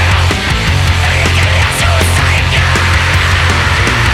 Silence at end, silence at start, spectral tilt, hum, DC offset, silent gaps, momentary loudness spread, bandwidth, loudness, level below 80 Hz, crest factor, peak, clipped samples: 0 s; 0 s; -4 dB/octave; none; under 0.1%; none; 1 LU; 15 kHz; -10 LUFS; -18 dBFS; 10 dB; 0 dBFS; under 0.1%